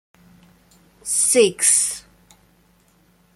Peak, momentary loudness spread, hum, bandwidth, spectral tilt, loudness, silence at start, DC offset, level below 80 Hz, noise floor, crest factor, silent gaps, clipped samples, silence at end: -2 dBFS; 17 LU; none; 15 kHz; -1 dB/octave; -16 LUFS; 1.05 s; under 0.1%; -62 dBFS; -58 dBFS; 22 dB; none; under 0.1%; 1.35 s